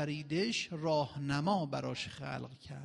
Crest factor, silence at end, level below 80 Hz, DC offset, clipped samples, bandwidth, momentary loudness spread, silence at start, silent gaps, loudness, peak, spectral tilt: 16 dB; 0 s; -68 dBFS; under 0.1%; under 0.1%; 11.5 kHz; 9 LU; 0 s; none; -36 LUFS; -20 dBFS; -5.5 dB/octave